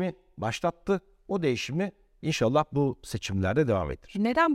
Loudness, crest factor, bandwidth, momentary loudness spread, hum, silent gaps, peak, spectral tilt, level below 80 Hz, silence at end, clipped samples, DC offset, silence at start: -29 LUFS; 16 dB; 16 kHz; 9 LU; none; none; -10 dBFS; -6 dB/octave; -50 dBFS; 0 s; under 0.1%; under 0.1%; 0 s